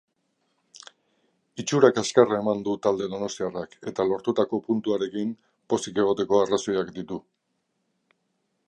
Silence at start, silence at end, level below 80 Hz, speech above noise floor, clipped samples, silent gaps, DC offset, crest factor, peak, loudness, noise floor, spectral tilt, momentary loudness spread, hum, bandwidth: 1.55 s; 1.45 s; -66 dBFS; 51 dB; under 0.1%; none; under 0.1%; 24 dB; -2 dBFS; -25 LUFS; -76 dBFS; -5 dB/octave; 14 LU; none; 10.5 kHz